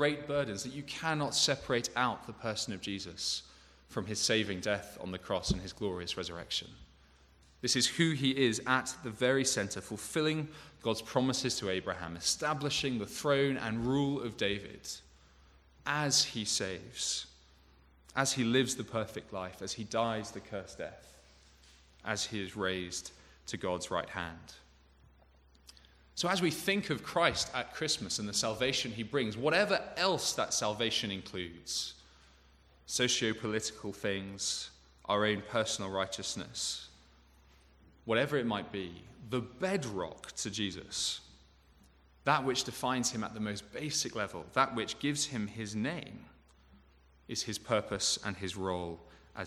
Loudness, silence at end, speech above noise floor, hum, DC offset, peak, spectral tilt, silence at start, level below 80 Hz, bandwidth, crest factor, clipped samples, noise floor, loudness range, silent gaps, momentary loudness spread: -34 LUFS; 0 s; 29 dB; none; under 0.1%; -10 dBFS; -3 dB/octave; 0 s; -60 dBFS; 15 kHz; 24 dB; under 0.1%; -63 dBFS; 6 LU; none; 12 LU